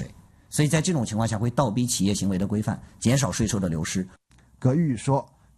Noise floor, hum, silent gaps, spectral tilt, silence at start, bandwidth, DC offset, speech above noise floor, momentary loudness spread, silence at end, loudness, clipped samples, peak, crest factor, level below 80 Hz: -46 dBFS; none; none; -5.5 dB/octave; 0 s; 13 kHz; under 0.1%; 23 dB; 7 LU; 0.35 s; -25 LUFS; under 0.1%; -8 dBFS; 16 dB; -48 dBFS